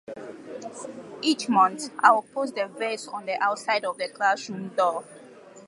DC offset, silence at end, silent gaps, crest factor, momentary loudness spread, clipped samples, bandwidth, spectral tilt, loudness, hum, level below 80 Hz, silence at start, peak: under 0.1%; 0.05 s; none; 24 dB; 19 LU; under 0.1%; 11.5 kHz; -3.5 dB/octave; -25 LUFS; none; -80 dBFS; 0.1 s; -2 dBFS